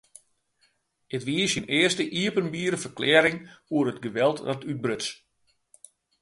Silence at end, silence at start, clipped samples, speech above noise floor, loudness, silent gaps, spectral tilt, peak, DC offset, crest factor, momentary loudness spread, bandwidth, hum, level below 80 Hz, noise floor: 1.05 s; 1.1 s; under 0.1%; 43 dB; -25 LUFS; none; -4 dB/octave; -2 dBFS; under 0.1%; 24 dB; 11 LU; 11.5 kHz; none; -66 dBFS; -69 dBFS